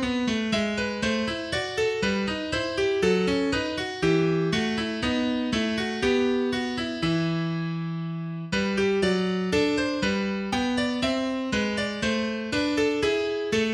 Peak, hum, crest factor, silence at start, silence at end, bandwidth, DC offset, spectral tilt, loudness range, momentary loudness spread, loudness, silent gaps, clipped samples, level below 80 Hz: -10 dBFS; none; 14 dB; 0 s; 0 s; 12.5 kHz; under 0.1%; -5 dB/octave; 2 LU; 5 LU; -26 LUFS; none; under 0.1%; -48 dBFS